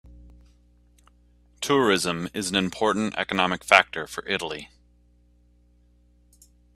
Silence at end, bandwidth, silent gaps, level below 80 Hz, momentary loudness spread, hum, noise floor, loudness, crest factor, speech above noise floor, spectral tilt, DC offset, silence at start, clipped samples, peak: 2.1 s; 14.5 kHz; none; -56 dBFS; 14 LU; 60 Hz at -55 dBFS; -59 dBFS; -23 LUFS; 28 dB; 35 dB; -3.5 dB/octave; under 0.1%; 0.1 s; under 0.1%; 0 dBFS